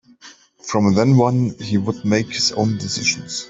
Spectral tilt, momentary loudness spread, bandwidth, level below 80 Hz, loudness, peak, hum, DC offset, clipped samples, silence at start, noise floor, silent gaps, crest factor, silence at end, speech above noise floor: -5 dB/octave; 7 LU; 8 kHz; -56 dBFS; -18 LUFS; -2 dBFS; none; under 0.1%; under 0.1%; 0.25 s; -46 dBFS; none; 16 dB; 0 s; 28 dB